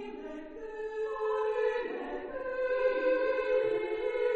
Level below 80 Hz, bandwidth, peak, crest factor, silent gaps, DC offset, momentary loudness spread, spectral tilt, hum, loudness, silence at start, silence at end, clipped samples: -60 dBFS; 7 kHz; -18 dBFS; 14 dB; none; under 0.1%; 13 LU; -5 dB/octave; none; -32 LUFS; 0 s; 0 s; under 0.1%